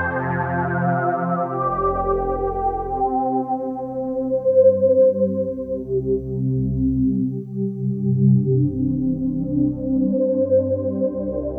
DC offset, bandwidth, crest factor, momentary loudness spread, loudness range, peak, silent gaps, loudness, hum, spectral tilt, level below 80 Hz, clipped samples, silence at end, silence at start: under 0.1%; 2.8 kHz; 14 dB; 9 LU; 3 LU; -4 dBFS; none; -21 LUFS; none; -13 dB/octave; -38 dBFS; under 0.1%; 0 s; 0 s